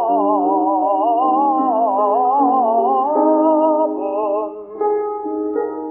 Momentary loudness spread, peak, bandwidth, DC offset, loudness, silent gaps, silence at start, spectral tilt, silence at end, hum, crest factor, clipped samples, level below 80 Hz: 8 LU; -4 dBFS; 3.1 kHz; under 0.1%; -17 LUFS; none; 0 s; -6 dB/octave; 0 s; none; 12 dB; under 0.1%; -68 dBFS